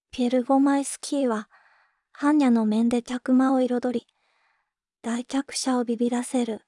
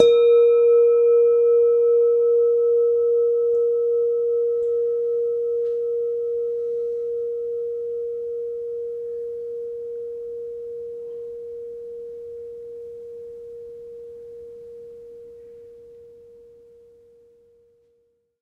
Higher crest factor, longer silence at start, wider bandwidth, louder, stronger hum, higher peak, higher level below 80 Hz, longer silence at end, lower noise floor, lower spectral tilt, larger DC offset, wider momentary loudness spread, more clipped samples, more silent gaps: second, 14 dB vs 22 dB; first, 0.15 s vs 0 s; first, 12 kHz vs 3.9 kHz; second, -24 LUFS vs -21 LUFS; neither; second, -10 dBFS vs 0 dBFS; about the same, -68 dBFS vs -66 dBFS; second, 0.1 s vs 2.3 s; first, -77 dBFS vs -66 dBFS; about the same, -4.5 dB/octave vs -4.5 dB/octave; neither; second, 9 LU vs 23 LU; neither; neither